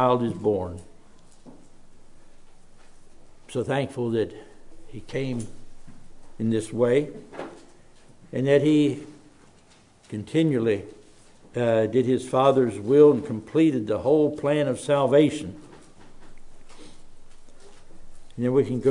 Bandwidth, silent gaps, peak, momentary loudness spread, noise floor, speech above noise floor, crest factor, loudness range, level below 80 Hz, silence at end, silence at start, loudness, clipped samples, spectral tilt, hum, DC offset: 11 kHz; none; -6 dBFS; 19 LU; -55 dBFS; 33 dB; 20 dB; 11 LU; -52 dBFS; 0 s; 0 s; -23 LUFS; under 0.1%; -7 dB/octave; none; under 0.1%